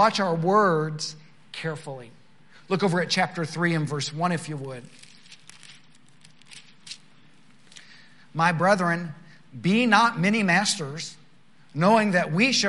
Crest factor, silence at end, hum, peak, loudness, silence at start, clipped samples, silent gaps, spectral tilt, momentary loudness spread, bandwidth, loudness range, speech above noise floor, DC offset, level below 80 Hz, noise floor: 22 dB; 0 s; none; -4 dBFS; -23 LUFS; 0 s; under 0.1%; none; -4.5 dB/octave; 20 LU; 11.5 kHz; 11 LU; 35 dB; 0.3%; -74 dBFS; -58 dBFS